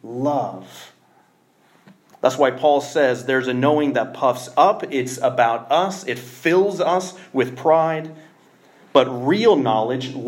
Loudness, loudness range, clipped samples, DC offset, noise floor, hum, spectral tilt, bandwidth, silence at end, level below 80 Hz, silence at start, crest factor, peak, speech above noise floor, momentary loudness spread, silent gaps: -19 LUFS; 3 LU; under 0.1%; under 0.1%; -58 dBFS; none; -5 dB/octave; 16.5 kHz; 0 s; -74 dBFS; 0.05 s; 18 dB; -2 dBFS; 39 dB; 8 LU; none